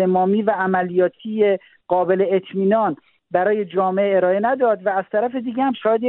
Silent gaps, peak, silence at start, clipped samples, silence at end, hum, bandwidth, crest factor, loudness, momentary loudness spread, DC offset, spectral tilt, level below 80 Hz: none; -4 dBFS; 0 s; under 0.1%; 0 s; none; 4.1 kHz; 14 dB; -19 LUFS; 5 LU; under 0.1%; -5.5 dB/octave; -66 dBFS